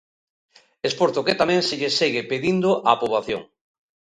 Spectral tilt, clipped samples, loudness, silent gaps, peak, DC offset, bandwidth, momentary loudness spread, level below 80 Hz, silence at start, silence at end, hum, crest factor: -4.5 dB/octave; under 0.1%; -21 LUFS; none; -2 dBFS; under 0.1%; 11 kHz; 8 LU; -60 dBFS; 0.85 s; 0.75 s; none; 22 dB